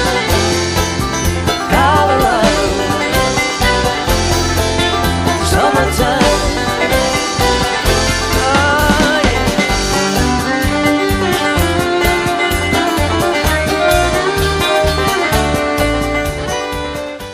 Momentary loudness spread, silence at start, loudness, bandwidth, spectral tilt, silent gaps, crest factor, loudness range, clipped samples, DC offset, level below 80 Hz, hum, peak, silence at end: 4 LU; 0 s; -13 LUFS; 15.5 kHz; -4 dB/octave; none; 14 dB; 1 LU; under 0.1%; under 0.1%; -24 dBFS; none; 0 dBFS; 0 s